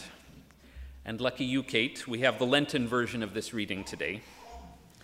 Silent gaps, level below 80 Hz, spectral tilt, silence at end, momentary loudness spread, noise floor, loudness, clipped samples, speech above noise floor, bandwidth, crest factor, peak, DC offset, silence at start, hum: none; -56 dBFS; -4.5 dB/octave; 0.15 s; 22 LU; -55 dBFS; -31 LUFS; under 0.1%; 24 dB; 16 kHz; 22 dB; -10 dBFS; under 0.1%; 0 s; none